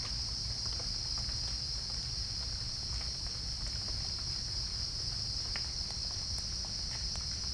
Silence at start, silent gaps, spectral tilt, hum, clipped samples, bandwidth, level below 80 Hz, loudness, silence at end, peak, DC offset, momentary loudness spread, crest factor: 0 s; none; -2 dB/octave; none; under 0.1%; 10.5 kHz; -44 dBFS; -35 LUFS; 0 s; -22 dBFS; under 0.1%; 2 LU; 16 dB